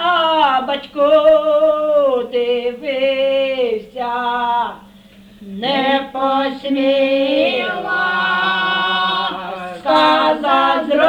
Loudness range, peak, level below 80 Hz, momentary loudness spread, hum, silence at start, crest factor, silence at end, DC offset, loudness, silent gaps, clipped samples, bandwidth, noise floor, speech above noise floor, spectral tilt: 4 LU; -2 dBFS; -54 dBFS; 9 LU; none; 0 s; 14 dB; 0 s; under 0.1%; -16 LUFS; none; under 0.1%; 10 kHz; -43 dBFS; 30 dB; -5 dB/octave